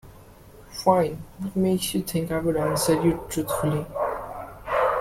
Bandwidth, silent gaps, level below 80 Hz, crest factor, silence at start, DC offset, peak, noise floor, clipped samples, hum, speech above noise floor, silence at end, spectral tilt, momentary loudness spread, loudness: 16.5 kHz; none; -48 dBFS; 20 dB; 0.05 s; under 0.1%; -6 dBFS; -48 dBFS; under 0.1%; none; 24 dB; 0 s; -5.5 dB/octave; 12 LU; -25 LUFS